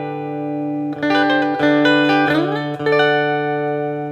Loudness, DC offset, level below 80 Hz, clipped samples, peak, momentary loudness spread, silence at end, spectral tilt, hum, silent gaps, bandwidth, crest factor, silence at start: -17 LUFS; under 0.1%; -64 dBFS; under 0.1%; -2 dBFS; 10 LU; 0 s; -6.5 dB/octave; none; none; 8 kHz; 14 dB; 0 s